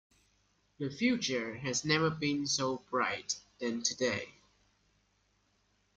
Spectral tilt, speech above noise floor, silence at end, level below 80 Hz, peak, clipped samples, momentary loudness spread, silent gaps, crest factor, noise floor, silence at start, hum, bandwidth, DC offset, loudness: -3.5 dB/octave; 41 dB; 1.65 s; -70 dBFS; -16 dBFS; under 0.1%; 9 LU; none; 20 dB; -74 dBFS; 0.8 s; 50 Hz at -65 dBFS; 10 kHz; under 0.1%; -33 LUFS